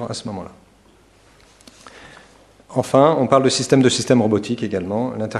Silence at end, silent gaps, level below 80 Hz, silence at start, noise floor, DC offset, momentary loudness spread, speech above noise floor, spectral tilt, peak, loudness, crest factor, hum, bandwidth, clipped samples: 0 s; none; -56 dBFS; 0 s; -52 dBFS; under 0.1%; 14 LU; 35 dB; -5 dB/octave; 0 dBFS; -17 LUFS; 20 dB; none; 12.5 kHz; under 0.1%